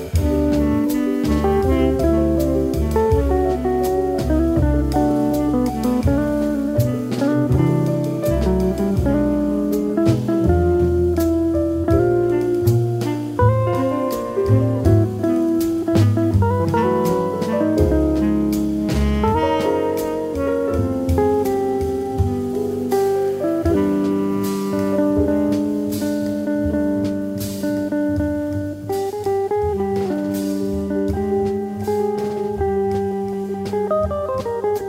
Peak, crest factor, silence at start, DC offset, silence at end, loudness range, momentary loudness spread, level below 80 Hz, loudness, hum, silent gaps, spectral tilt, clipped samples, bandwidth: -4 dBFS; 14 dB; 0 s; under 0.1%; 0 s; 4 LU; 5 LU; -30 dBFS; -19 LUFS; none; none; -8 dB/octave; under 0.1%; 16 kHz